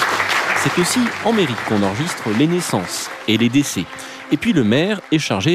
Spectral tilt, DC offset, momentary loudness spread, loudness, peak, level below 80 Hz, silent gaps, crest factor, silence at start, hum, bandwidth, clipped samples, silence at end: -4.5 dB/octave; under 0.1%; 7 LU; -18 LUFS; -6 dBFS; -54 dBFS; none; 12 dB; 0 s; none; 14.5 kHz; under 0.1%; 0 s